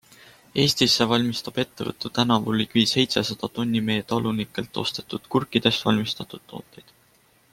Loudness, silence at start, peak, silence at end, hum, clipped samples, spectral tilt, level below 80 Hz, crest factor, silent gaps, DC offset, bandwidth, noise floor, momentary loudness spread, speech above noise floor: -23 LUFS; 0.55 s; -2 dBFS; 0.9 s; none; under 0.1%; -4.5 dB/octave; -58 dBFS; 22 dB; none; under 0.1%; 16.5 kHz; -60 dBFS; 11 LU; 36 dB